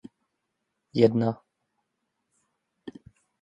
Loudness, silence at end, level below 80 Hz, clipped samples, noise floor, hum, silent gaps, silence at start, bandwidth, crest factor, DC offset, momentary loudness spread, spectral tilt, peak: -25 LUFS; 0.5 s; -68 dBFS; under 0.1%; -80 dBFS; none; none; 0.95 s; 7.8 kHz; 24 dB; under 0.1%; 24 LU; -8.5 dB/octave; -6 dBFS